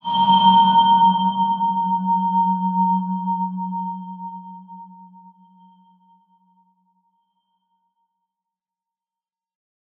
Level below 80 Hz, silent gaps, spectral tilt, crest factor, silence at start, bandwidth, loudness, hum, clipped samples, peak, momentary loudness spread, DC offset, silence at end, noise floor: -76 dBFS; none; -8.5 dB/octave; 18 dB; 0.05 s; 4.1 kHz; -18 LUFS; none; under 0.1%; -4 dBFS; 21 LU; under 0.1%; 4.95 s; under -90 dBFS